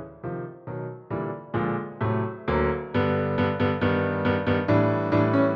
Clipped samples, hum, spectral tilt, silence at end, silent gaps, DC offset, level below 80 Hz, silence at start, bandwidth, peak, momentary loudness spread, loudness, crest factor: under 0.1%; none; -9.5 dB/octave; 0 s; none; under 0.1%; -46 dBFS; 0 s; 5.8 kHz; -10 dBFS; 13 LU; -25 LUFS; 16 dB